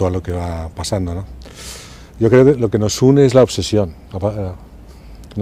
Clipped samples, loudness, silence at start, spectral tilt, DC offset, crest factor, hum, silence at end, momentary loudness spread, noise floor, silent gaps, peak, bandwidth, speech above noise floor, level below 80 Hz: under 0.1%; -15 LUFS; 0 s; -6.5 dB/octave; under 0.1%; 16 dB; none; 0 s; 21 LU; -37 dBFS; none; 0 dBFS; 15.5 kHz; 22 dB; -38 dBFS